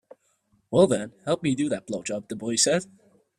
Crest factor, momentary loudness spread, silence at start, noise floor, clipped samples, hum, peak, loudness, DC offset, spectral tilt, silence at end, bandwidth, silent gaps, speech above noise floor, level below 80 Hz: 20 dB; 11 LU; 0.7 s; -68 dBFS; under 0.1%; none; -6 dBFS; -25 LUFS; under 0.1%; -4 dB/octave; 0.55 s; 14 kHz; none; 43 dB; -64 dBFS